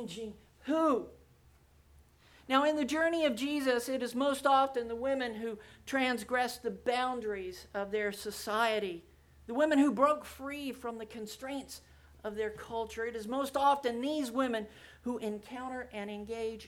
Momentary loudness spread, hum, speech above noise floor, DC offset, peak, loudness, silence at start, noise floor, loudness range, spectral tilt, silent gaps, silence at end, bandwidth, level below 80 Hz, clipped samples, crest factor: 14 LU; none; 30 dB; under 0.1%; -14 dBFS; -33 LUFS; 0 s; -63 dBFS; 4 LU; -4 dB/octave; none; 0 s; 18.5 kHz; -64 dBFS; under 0.1%; 20 dB